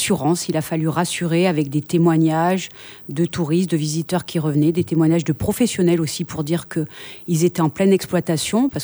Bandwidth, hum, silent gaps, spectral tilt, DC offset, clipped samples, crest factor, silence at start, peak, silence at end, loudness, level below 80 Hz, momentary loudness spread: over 20 kHz; none; none; -6 dB/octave; under 0.1%; under 0.1%; 14 dB; 0 s; -6 dBFS; 0 s; -19 LUFS; -52 dBFS; 7 LU